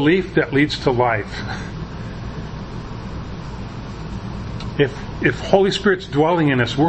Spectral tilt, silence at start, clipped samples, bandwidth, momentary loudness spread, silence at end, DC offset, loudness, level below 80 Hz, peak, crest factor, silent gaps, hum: -6.5 dB/octave; 0 s; under 0.1%; 8.6 kHz; 15 LU; 0 s; under 0.1%; -20 LUFS; -36 dBFS; 0 dBFS; 20 dB; none; none